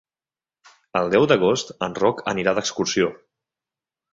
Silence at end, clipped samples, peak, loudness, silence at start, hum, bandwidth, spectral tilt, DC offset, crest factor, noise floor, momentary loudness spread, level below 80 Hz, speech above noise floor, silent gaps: 0.95 s; under 0.1%; -2 dBFS; -21 LUFS; 0.95 s; none; 7.8 kHz; -4 dB/octave; under 0.1%; 20 dB; under -90 dBFS; 8 LU; -58 dBFS; over 69 dB; none